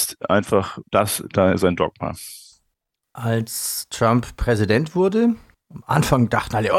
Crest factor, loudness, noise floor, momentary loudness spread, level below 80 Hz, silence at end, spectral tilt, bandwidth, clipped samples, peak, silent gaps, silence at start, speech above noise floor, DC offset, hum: 18 dB; -20 LUFS; -76 dBFS; 12 LU; -40 dBFS; 0 s; -5.5 dB/octave; 16.5 kHz; under 0.1%; -2 dBFS; none; 0 s; 56 dB; under 0.1%; none